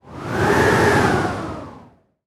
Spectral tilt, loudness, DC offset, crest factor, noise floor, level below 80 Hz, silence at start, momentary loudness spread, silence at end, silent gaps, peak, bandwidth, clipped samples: -5.5 dB/octave; -18 LUFS; under 0.1%; 16 dB; -48 dBFS; -40 dBFS; 0.05 s; 15 LU; 0.45 s; none; -2 dBFS; 15.5 kHz; under 0.1%